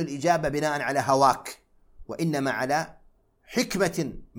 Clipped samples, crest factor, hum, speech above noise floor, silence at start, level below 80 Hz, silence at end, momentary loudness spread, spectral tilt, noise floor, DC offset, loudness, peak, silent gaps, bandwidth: under 0.1%; 20 dB; none; 34 dB; 0 s; -52 dBFS; 0 s; 11 LU; -4.5 dB/octave; -59 dBFS; under 0.1%; -25 LUFS; -6 dBFS; none; 17.5 kHz